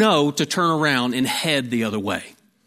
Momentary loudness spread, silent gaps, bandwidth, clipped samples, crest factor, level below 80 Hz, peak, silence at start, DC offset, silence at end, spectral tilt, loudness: 7 LU; none; 16 kHz; under 0.1%; 18 dB; -64 dBFS; -4 dBFS; 0 s; under 0.1%; 0.35 s; -4 dB/octave; -21 LUFS